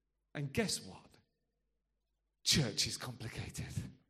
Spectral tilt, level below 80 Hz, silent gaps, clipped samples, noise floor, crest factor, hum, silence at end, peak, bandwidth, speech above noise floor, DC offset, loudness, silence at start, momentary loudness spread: -3 dB/octave; -60 dBFS; none; under 0.1%; -85 dBFS; 24 dB; none; 0.15 s; -16 dBFS; 15 kHz; 47 dB; under 0.1%; -37 LUFS; 0.35 s; 14 LU